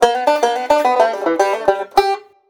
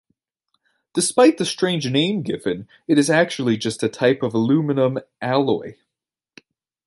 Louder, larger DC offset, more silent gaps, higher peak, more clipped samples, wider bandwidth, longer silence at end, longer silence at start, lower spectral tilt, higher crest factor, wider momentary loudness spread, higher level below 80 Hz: first, -16 LUFS vs -20 LUFS; neither; neither; about the same, 0 dBFS vs -2 dBFS; neither; first, over 20 kHz vs 11.5 kHz; second, 0.3 s vs 1.15 s; second, 0 s vs 0.95 s; second, -2.5 dB/octave vs -5 dB/octave; about the same, 14 dB vs 18 dB; second, 3 LU vs 10 LU; first, -52 dBFS vs -64 dBFS